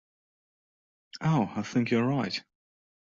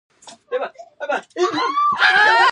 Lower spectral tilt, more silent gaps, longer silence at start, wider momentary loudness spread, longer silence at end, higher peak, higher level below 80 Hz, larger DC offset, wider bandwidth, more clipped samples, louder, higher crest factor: first, -6.5 dB/octave vs -2 dB/octave; neither; first, 1.15 s vs 0.25 s; second, 9 LU vs 16 LU; first, 0.6 s vs 0 s; second, -14 dBFS vs -2 dBFS; first, -68 dBFS vs -76 dBFS; neither; second, 7.6 kHz vs 11 kHz; neither; second, -29 LUFS vs -17 LUFS; about the same, 18 dB vs 16 dB